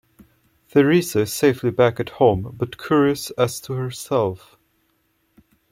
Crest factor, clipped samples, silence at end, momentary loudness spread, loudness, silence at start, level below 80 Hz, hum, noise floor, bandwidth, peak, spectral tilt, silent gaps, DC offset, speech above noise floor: 18 dB; under 0.1%; 1.35 s; 10 LU; -20 LUFS; 0.75 s; -54 dBFS; none; -66 dBFS; 16.5 kHz; -2 dBFS; -5.5 dB/octave; none; under 0.1%; 47 dB